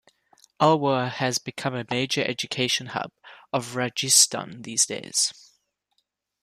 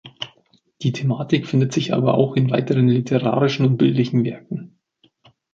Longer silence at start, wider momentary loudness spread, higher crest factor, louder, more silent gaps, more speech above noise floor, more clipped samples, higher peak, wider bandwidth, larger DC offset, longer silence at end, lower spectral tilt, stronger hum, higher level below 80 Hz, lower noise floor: first, 0.6 s vs 0.05 s; about the same, 13 LU vs 14 LU; first, 24 dB vs 16 dB; second, -23 LUFS vs -19 LUFS; neither; first, 50 dB vs 43 dB; neither; about the same, -2 dBFS vs -4 dBFS; first, 15 kHz vs 7.6 kHz; neither; first, 1.1 s vs 0.9 s; second, -2.5 dB/octave vs -7.5 dB/octave; neither; second, -68 dBFS vs -60 dBFS; first, -75 dBFS vs -62 dBFS